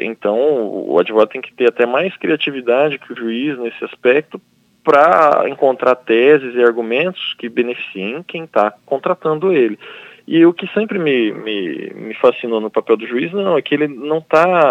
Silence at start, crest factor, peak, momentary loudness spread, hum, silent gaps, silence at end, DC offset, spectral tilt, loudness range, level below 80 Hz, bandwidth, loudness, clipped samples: 0 s; 16 dB; 0 dBFS; 12 LU; none; none; 0 s; under 0.1%; -7 dB/octave; 4 LU; -70 dBFS; 7.8 kHz; -16 LUFS; under 0.1%